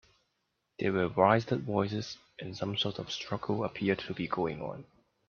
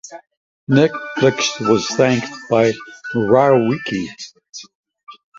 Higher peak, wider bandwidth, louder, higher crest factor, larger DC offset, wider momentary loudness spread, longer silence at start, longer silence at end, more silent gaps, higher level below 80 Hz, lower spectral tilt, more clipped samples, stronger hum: second, -8 dBFS vs -2 dBFS; second, 7 kHz vs 7.8 kHz; second, -32 LUFS vs -17 LUFS; first, 24 dB vs 16 dB; neither; second, 16 LU vs 21 LU; first, 0.8 s vs 0.05 s; first, 0.45 s vs 0.25 s; second, none vs 0.37-0.67 s, 4.75-4.83 s; second, -66 dBFS vs -56 dBFS; about the same, -6 dB/octave vs -5 dB/octave; neither; neither